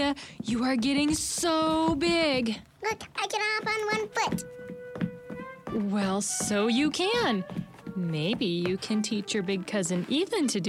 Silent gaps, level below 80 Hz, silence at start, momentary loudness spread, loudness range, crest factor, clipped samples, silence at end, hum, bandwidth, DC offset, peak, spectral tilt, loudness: none; -56 dBFS; 0 s; 10 LU; 3 LU; 16 dB; under 0.1%; 0 s; none; 16 kHz; under 0.1%; -14 dBFS; -4 dB/octave; -28 LUFS